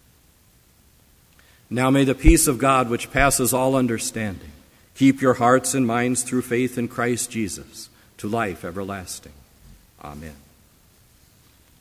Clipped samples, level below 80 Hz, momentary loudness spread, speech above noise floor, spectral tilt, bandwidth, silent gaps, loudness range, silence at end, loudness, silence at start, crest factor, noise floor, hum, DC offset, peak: under 0.1%; -34 dBFS; 21 LU; 35 dB; -4.5 dB/octave; 16 kHz; none; 13 LU; 1.45 s; -21 LUFS; 1.7 s; 22 dB; -56 dBFS; none; under 0.1%; 0 dBFS